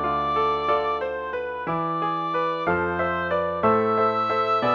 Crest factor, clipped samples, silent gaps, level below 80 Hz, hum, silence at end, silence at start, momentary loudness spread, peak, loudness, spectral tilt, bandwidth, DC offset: 16 dB; under 0.1%; none; -52 dBFS; none; 0 s; 0 s; 7 LU; -8 dBFS; -23 LUFS; -7 dB/octave; 7 kHz; under 0.1%